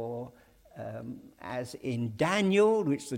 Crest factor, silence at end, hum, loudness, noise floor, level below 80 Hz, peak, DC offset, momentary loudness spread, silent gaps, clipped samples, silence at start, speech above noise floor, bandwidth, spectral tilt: 16 dB; 0 s; none; -29 LUFS; -56 dBFS; -66 dBFS; -14 dBFS; under 0.1%; 20 LU; none; under 0.1%; 0 s; 27 dB; 16 kHz; -6 dB/octave